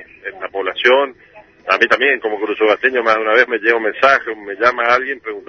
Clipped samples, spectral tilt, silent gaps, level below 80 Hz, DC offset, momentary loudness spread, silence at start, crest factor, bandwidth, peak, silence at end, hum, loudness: under 0.1%; -3.5 dB/octave; none; -58 dBFS; under 0.1%; 11 LU; 0 s; 16 dB; 7 kHz; 0 dBFS; 0.05 s; none; -15 LUFS